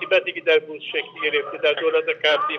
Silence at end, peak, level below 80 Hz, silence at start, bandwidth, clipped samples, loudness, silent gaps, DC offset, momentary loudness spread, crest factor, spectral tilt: 0 s; -6 dBFS; -86 dBFS; 0 s; 6.4 kHz; under 0.1%; -21 LUFS; none; under 0.1%; 7 LU; 16 dB; -3 dB/octave